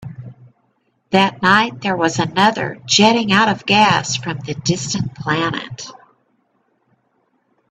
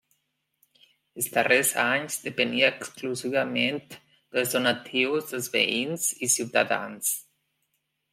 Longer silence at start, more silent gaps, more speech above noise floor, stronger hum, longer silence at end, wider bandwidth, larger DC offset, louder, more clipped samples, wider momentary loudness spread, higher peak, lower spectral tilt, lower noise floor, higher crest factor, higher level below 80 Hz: second, 0 s vs 1.15 s; neither; about the same, 48 dB vs 50 dB; neither; first, 1.8 s vs 0.9 s; second, 9.8 kHz vs 16.5 kHz; neither; first, -16 LUFS vs -25 LUFS; neither; first, 14 LU vs 10 LU; first, 0 dBFS vs -6 dBFS; first, -4 dB/octave vs -2 dB/octave; second, -64 dBFS vs -76 dBFS; about the same, 18 dB vs 22 dB; first, -54 dBFS vs -76 dBFS